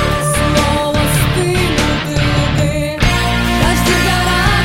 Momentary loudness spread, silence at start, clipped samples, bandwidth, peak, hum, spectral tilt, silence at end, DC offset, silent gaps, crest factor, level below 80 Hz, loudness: 3 LU; 0 s; under 0.1%; 16.5 kHz; 0 dBFS; none; -4.5 dB/octave; 0 s; 0.9%; none; 12 dB; -22 dBFS; -13 LUFS